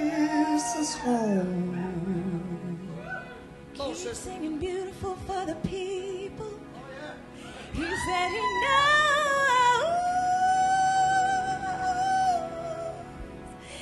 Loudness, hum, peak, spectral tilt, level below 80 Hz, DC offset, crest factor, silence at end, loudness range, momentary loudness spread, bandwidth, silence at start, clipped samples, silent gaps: -27 LUFS; none; -10 dBFS; -4 dB/octave; -52 dBFS; under 0.1%; 18 dB; 0 s; 12 LU; 19 LU; 12.5 kHz; 0 s; under 0.1%; none